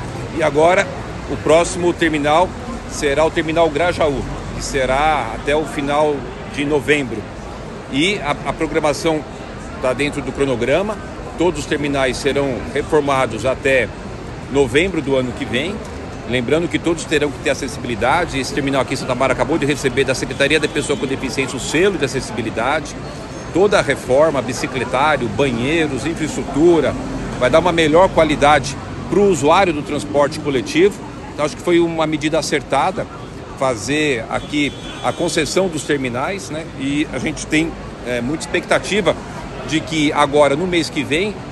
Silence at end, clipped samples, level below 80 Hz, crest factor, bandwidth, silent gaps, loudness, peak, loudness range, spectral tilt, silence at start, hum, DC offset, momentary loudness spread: 0 s; under 0.1%; -36 dBFS; 18 dB; 12.5 kHz; none; -17 LUFS; 0 dBFS; 5 LU; -4.5 dB/octave; 0 s; none; under 0.1%; 11 LU